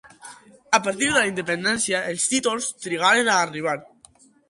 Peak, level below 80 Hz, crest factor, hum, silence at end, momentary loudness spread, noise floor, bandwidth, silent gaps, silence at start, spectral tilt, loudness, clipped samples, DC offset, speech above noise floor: -4 dBFS; -62 dBFS; 18 dB; none; 0.65 s; 9 LU; -54 dBFS; 11.5 kHz; none; 0.05 s; -2 dB/octave; -21 LUFS; under 0.1%; under 0.1%; 32 dB